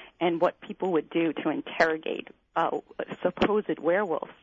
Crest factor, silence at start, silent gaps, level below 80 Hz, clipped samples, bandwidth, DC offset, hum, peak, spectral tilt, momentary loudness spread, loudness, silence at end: 18 dB; 0 s; none; -62 dBFS; under 0.1%; 7.8 kHz; under 0.1%; none; -10 dBFS; -6.5 dB/octave; 8 LU; -28 LUFS; 0.1 s